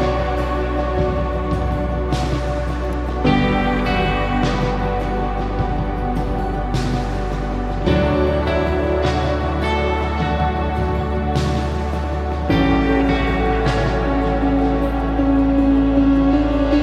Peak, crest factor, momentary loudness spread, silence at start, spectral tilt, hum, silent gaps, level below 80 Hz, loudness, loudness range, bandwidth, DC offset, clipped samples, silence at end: -4 dBFS; 14 dB; 7 LU; 0 s; -7.5 dB/octave; none; none; -24 dBFS; -19 LUFS; 4 LU; 10 kHz; under 0.1%; under 0.1%; 0 s